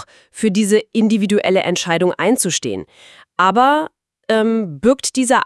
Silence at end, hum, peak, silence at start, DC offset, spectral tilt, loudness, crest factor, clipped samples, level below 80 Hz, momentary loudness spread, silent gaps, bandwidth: 0 s; none; 0 dBFS; 0 s; under 0.1%; -4 dB/octave; -16 LUFS; 16 dB; under 0.1%; -58 dBFS; 12 LU; none; 12 kHz